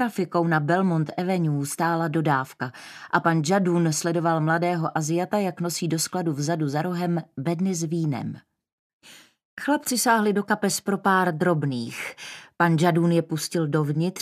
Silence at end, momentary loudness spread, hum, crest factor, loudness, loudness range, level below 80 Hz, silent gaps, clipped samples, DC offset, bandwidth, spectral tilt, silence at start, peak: 0 s; 11 LU; none; 18 dB; -24 LUFS; 4 LU; -72 dBFS; 8.72-9.00 s, 9.45-9.57 s; under 0.1%; under 0.1%; 15 kHz; -5.5 dB/octave; 0 s; -6 dBFS